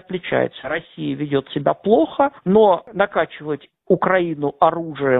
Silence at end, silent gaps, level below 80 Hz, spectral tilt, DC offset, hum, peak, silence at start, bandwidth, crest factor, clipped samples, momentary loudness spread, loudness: 0 s; none; -54 dBFS; -11 dB/octave; under 0.1%; none; 0 dBFS; 0.1 s; 4 kHz; 18 dB; under 0.1%; 11 LU; -19 LUFS